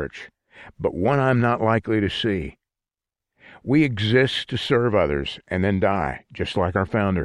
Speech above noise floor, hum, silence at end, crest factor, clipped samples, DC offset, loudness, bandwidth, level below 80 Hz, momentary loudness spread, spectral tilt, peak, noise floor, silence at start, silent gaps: 68 dB; none; 0 s; 16 dB; under 0.1%; under 0.1%; -22 LUFS; 11 kHz; -44 dBFS; 10 LU; -7 dB/octave; -6 dBFS; -89 dBFS; 0 s; none